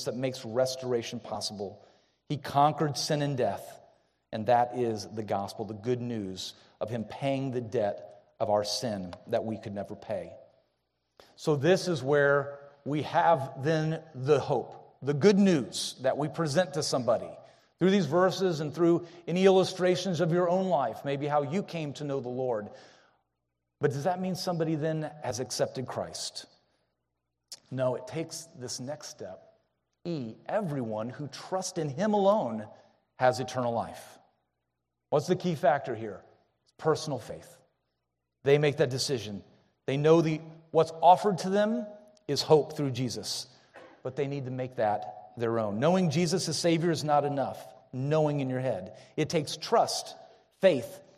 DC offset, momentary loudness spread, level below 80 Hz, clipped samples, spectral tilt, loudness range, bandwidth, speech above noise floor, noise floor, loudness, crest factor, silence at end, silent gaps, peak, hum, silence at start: under 0.1%; 15 LU; -72 dBFS; under 0.1%; -5.5 dB/octave; 7 LU; 14 kHz; 55 dB; -83 dBFS; -29 LUFS; 22 dB; 0.15 s; none; -8 dBFS; none; 0 s